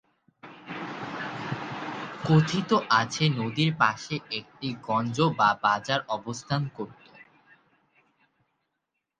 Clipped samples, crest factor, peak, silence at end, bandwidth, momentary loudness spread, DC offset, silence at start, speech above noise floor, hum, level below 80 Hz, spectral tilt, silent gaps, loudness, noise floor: under 0.1%; 22 dB; -6 dBFS; 1.95 s; 9.2 kHz; 13 LU; under 0.1%; 0.45 s; 56 dB; none; -64 dBFS; -5.5 dB/octave; none; -27 LUFS; -82 dBFS